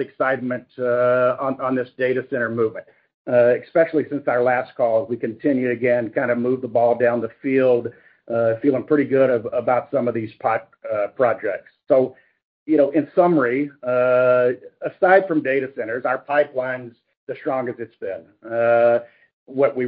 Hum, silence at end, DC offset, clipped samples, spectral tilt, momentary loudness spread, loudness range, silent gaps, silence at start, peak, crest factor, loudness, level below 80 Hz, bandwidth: none; 0 s; under 0.1%; under 0.1%; -11.5 dB/octave; 11 LU; 4 LU; 3.14-3.25 s, 12.43-12.66 s, 17.17-17.27 s, 19.33-19.46 s; 0 s; -2 dBFS; 18 dB; -20 LUFS; -68 dBFS; 4.9 kHz